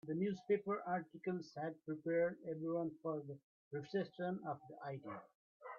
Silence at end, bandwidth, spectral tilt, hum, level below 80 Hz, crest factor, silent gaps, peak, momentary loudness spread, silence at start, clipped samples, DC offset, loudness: 0 s; 7 kHz; -6.5 dB/octave; none; -86 dBFS; 18 dB; 3.44-3.71 s, 5.35-5.60 s; -26 dBFS; 12 LU; 0.05 s; under 0.1%; under 0.1%; -43 LUFS